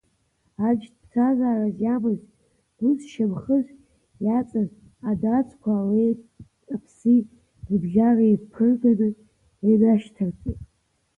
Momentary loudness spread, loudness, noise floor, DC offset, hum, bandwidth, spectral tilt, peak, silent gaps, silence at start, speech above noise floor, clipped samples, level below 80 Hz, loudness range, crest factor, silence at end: 14 LU; -23 LUFS; -69 dBFS; under 0.1%; none; 3.5 kHz; -9.5 dB/octave; -8 dBFS; none; 0.6 s; 48 dB; under 0.1%; -52 dBFS; 4 LU; 14 dB; 0.55 s